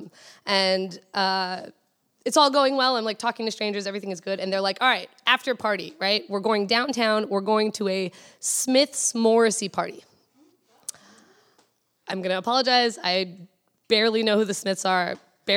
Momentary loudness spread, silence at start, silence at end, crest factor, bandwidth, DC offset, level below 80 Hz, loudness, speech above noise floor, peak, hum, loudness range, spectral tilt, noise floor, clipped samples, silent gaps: 12 LU; 0 s; 0 s; 22 dB; 17.5 kHz; under 0.1%; -82 dBFS; -23 LUFS; 42 dB; -4 dBFS; none; 4 LU; -2.5 dB/octave; -66 dBFS; under 0.1%; none